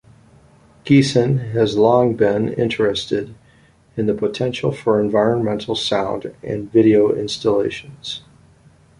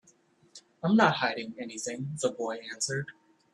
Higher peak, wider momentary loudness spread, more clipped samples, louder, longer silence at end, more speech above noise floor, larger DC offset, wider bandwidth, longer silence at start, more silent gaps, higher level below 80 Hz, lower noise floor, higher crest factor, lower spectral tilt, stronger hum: first, -2 dBFS vs -8 dBFS; about the same, 15 LU vs 13 LU; neither; first, -18 LUFS vs -30 LUFS; first, 0.8 s vs 0.4 s; about the same, 35 dB vs 34 dB; neither; about the same, 11 kHz vs 12 kHz; first, 0.85 s vs 0.55 s; neither; first, -50 dBFS vs -74 dBFS; second, -52 dBFS vs -64 dBFS; second, 16 dB vs 24 dB; first, -6.5 dB/octave vs -4 dB/octave; neither